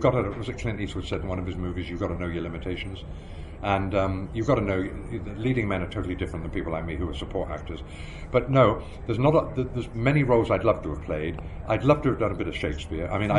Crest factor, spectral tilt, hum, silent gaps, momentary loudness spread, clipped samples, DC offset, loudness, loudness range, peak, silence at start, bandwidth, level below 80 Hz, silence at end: 20 dB; -7.5 dB/octave; none; none; 12 LU; under 0.1%; under 0.1%; -27 LUFS; 7 LU; -6 dBFS; 0 s; 11 kHz; -38 dBFS; 0 s